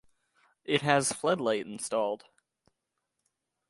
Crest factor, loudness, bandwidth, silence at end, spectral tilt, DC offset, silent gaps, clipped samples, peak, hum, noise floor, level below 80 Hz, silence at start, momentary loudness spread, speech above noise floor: 24 dB; -29 LUFS; 11.5 kHz; 1.55 s; -3.5 dB/octave; under 0.1%; none; under 0.1%; -10 dBFS; none; -83 dBFS; -76 dBFS; 0.7 s; 10 LU; 54 dB